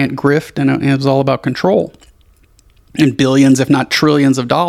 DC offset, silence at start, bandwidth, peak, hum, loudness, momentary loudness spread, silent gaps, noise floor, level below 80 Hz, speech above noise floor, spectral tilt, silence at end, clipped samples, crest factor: under 0.1%; 0 s; 14.5 kHz; 0 dBFS; none; -13 LUFS; 6 LU; none; -49 dBFS; -48 dBFS; 36 dB; -6 dB/octave; 0 s; under 0.1%; 14 dB